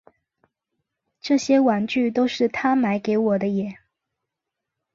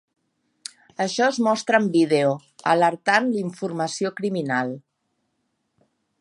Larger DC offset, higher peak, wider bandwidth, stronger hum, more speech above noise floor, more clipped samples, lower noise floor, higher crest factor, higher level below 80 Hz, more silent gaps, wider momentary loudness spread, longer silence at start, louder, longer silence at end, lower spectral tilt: neither; second, -8 dBFS vs -2 dBFS; second, 7.8 kHz vs 11.5 kHz; neither; first, 63 dB vs 53 dB; neither; first, -84 dBFS vs -74 dBFS; second, 16 dB vs 22 dB; first, -66 dBFS vs -76 dBFS; neither; second, 8 LU vs 16 LU; first, 1.25 s vs 1 s; about the same, -21 LUFS vs -22 LUFS; second, 1.2 s vs 1.4 s; about the same, -5.5 dB/octave vs -5 dB/octave